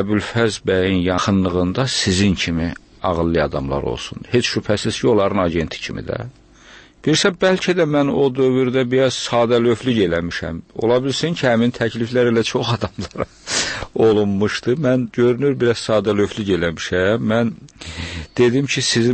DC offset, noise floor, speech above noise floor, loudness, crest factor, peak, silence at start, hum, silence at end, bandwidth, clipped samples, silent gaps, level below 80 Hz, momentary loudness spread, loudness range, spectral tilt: under 0.1%; -45 dBFS; 27 dB; -18 LUFS; 14 dB; -4 dBFS; 0 s; none; 0 s; 8.8 kHz; under 0.1%; none; -42 dBFS; 10 LU; 3 LU; -5 dB/octave